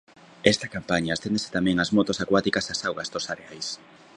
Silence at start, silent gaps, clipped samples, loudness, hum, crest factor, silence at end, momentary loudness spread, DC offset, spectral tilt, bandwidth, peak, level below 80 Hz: 0.45 s; none; under 0.1%; -25 LUFS; none; 26 dB; 0.4 s; 11 LU; under 0.1%; -4 dB/octave; 11 kHz; 0 dBFS; -54 dBFS